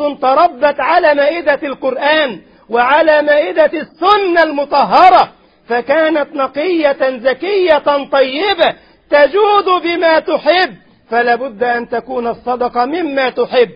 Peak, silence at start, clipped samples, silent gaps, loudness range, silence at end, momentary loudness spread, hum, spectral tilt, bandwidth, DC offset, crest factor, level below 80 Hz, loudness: 0 dBFS; 0 s; under 0.1%; none; 4 LU; 0 s; 9 LU; none; -6 dB/octave; 5.4 kHz; under 0.1%; 12 dB; -52 dBFS; -12 LUFS